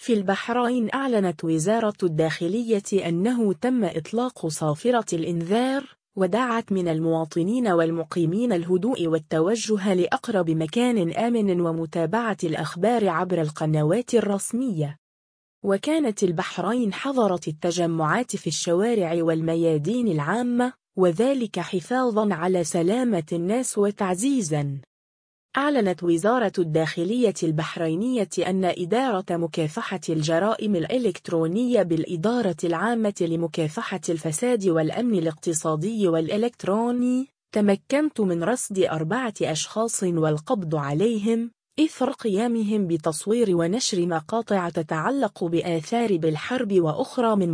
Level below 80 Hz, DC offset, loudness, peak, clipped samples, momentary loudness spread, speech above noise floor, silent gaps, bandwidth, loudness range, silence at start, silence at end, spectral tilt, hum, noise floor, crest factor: -66 dBFS; under 0.1%; -24 LUFS; -6 dBFS; under 0.1%; 4 LU; over 67 dB; 14.98-15.62 s, 24.87-25.49 s; 10.5 kHz; 1 LU; 0 s; 0 s; -5.5 dB/octave; none; under -90 dBFS; 16 dB